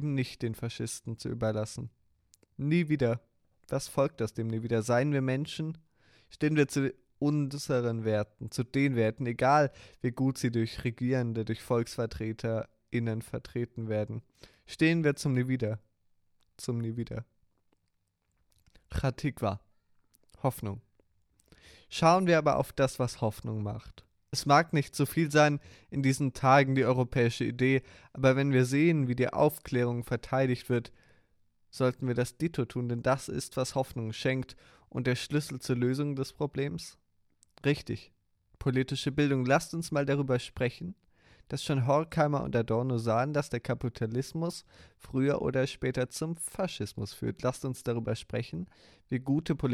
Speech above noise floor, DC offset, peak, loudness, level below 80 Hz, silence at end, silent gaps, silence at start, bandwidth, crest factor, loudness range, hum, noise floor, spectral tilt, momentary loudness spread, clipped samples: 48 dB; under 0.1%; -8 dBFS; -30 LUFS; -56 dBFS; 0 s; none; 0 s; 15.5 kHz; 22 dB; 7 LU; none; -77 dBFS; -6 dB/octave; 12 LU; under 0.1%